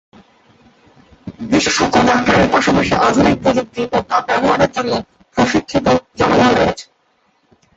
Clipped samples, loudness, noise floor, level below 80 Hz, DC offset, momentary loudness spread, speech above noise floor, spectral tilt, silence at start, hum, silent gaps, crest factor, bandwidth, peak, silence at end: under 0.1%; -14 LUFS; -60 dBFS; -40 dBFS; under 0.1%; 8 LU; 46 dB; -4.5 dB/octave; 1.25 s; none; none; 16 dB; 8.2 kHz; 0 dBFS; 0.95 s